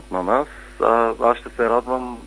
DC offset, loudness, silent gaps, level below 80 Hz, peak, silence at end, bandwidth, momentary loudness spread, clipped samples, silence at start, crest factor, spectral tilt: under 0.1%; -20 LUFS; none; -44 dBFS; 0 dBFS; 0 s; 10.5 kHz; 6 LU; under 0.1%; 0 s; 20 dB; -6 dB/octave